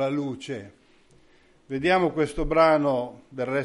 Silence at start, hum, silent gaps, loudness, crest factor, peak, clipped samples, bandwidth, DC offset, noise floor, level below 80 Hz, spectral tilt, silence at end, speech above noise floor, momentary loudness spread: 0 s; none; none; -24 LUFS; 18 dB; -6 dBFS; under 0.1%; 11.5 kHz; under 0.1%; -58 dBFS; -44 dBFS; -6.5 dB/octave; 0 s; 34 dB; 16 LU